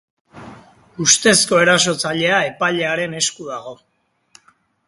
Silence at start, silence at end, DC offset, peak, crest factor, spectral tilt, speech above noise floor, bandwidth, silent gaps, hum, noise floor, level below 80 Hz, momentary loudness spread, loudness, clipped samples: 0.35 s; 1.15 s; under 0.1%; 0 dBFS; 20 dB; -2 dB/octave; 40 dB; 12 kHz; none; none; -57 dBFS; -58 dBFS; 18 LU; -15 LUFS; under 0.1%